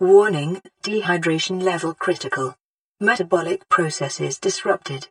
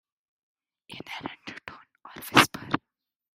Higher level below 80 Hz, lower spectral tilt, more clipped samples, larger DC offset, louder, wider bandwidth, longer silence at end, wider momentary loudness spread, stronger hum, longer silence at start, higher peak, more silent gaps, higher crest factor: about the same, -70 dBFS vs -66 dBFS; first, -4.5 dB/octave vs -3 dB/octave; neither; neither; first, -21 LUFS vs -25 LUFS; second, 11 kHz vs 16 kHz; second, 0.05 s vs 0.6 s; second, 7 LU vs 25 LU; neither; second, 0 s vs 0.9 s; about the same, -2 dBFS vs 0 dBFS; first, 2.65-2.95 s vs none; second, 18 dB vs 30 dB